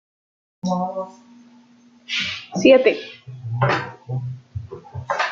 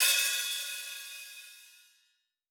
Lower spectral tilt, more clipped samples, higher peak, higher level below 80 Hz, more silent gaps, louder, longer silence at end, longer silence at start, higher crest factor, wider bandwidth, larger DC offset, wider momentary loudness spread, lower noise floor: first, -5.5 dB/octave vs 6.5 dB/octave; neither; first, -2 dBFS vs -14 dBFS; first, -58 dBFS vs under -90 dBFS; neither; first, -21 LUFS vs -31 LUFS; second, 0 s vs 0.8 s; first, 0.65 s vs 0 s; about the same, 22 dB vs 20 dB; second, 7.4 kHz vs over 20 kHz; neither; about the same, 21 LU vs 23 LU; second, -52 dBFS vs -75 dBFS